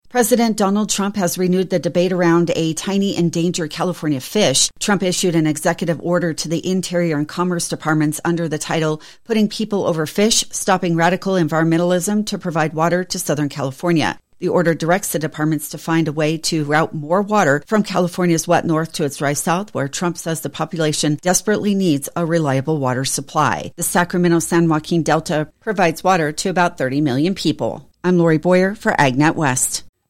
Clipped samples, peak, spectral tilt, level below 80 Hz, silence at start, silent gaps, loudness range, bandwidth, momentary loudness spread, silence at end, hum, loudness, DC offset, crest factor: under 0.1%; -2 dBFS; -4.5 dB/octave; -52 dBFS; 0.15 s; none; 2 LU; 16.5 kHz; 6 LU; 0.2 s; none; -18 LUFS; under 0.1%; 16 dB